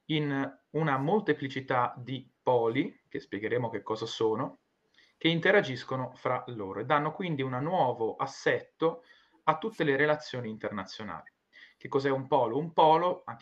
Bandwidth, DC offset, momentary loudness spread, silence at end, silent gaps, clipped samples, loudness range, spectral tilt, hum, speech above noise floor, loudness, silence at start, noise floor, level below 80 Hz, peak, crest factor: 8 kHz; under 0.1%; 13 LU; 0.05 s; none; under 0.1%; 2 LU; -6.5 dB/octave; none; 37 dB; -30 LUFS; 0.1 s; -66 dBFS; -74 dBFS; -10 dBFS; 22 dB